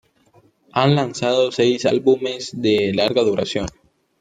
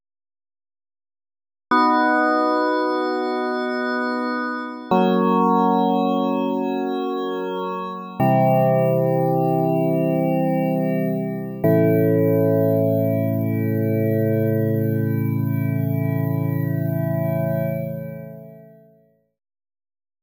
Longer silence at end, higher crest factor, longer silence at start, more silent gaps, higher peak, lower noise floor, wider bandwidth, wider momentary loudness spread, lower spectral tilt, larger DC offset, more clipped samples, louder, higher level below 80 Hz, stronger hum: second, 0.5 s vs 1.55 s; about the same, 18 dB vs 14 dB; second, 0.75 s vs 1.7 s; neither; first, -2 dBFS vs -6 dBFS; about the same, -56 dBFS vs -58 dBFS; second, 9.4 kHz vs over 20 kHz; about the same, 8 LU vs 8 LU; second, -5.5 dB/octave vs -9.5 dB/octave; neither; neither; about the same, -19 LUFS vs -20 LUFS; first, -52 dBFS vs -66 dBFS; neither